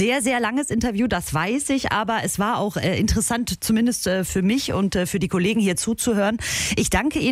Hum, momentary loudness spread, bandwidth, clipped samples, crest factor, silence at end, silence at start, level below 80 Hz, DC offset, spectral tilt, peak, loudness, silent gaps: none; 3 LU; 16 kHz; under 0.1%; 16 dB; 0 s; 0 s; -38 dBFS; under 0.1%; -4 dB/octave; -6 dBFS; -21 LUFS; none